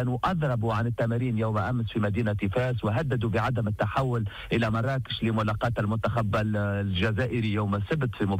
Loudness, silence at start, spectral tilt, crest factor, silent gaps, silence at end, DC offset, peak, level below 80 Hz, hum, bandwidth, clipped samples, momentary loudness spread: -27 LUFS; 0 s; -8 dB/octave; 10 dB; none; 0 s; under 0.1%; -16 dBFS; -48 dBFS; none; 9.4 kHz; under 0.1%; 2 LU